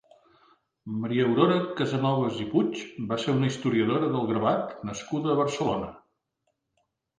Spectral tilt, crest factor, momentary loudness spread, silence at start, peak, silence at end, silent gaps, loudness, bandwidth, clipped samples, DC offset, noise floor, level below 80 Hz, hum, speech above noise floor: -6.5 dB/octave; 20 dB; 11 LU; 0.85 s; -8 dBFS; 1.2 s; none; -27 LUFS; 9.6 kHz; under 0.1%; under 0.1%; -78 dBFS; -62 dBFS; none; 52 dB